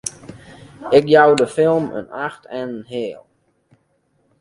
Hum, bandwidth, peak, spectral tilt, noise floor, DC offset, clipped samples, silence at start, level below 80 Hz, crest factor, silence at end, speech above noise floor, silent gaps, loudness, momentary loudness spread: none; 11.5 kHz; 0 dBFS; -5 dB/octave; -64 dBFS; under 0.1%; under 0.1%; 0.05 s; -58 dBFS; 18 dB; 1.2 s; 47 dB; none; -17 LUFS; 17 LU